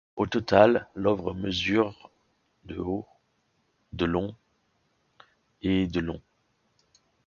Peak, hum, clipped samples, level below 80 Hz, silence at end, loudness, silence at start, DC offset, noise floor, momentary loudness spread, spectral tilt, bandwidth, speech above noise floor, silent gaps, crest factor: -2 dBFS; none; under 0.1%; -50 dBFS; 1.2 s; -26 LUFS; 0.15 s; under 0.1%; -72 dBFS; 16 LU; -6.5 dB/octave; 7.2 kHz; 46 dB; none; 26 dB